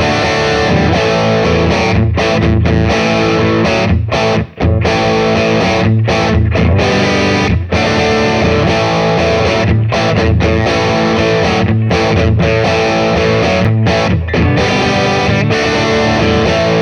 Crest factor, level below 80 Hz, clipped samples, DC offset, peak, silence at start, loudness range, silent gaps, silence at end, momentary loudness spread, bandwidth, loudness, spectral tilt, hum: 10 dB; -26 dBFS; under 0.1%; under 0.1%; 0 dBFS; 0 s; 0 LU; none; 0 s; 1 LU; 9.6 kHz; -11 LUFS; -6 dB/octave; none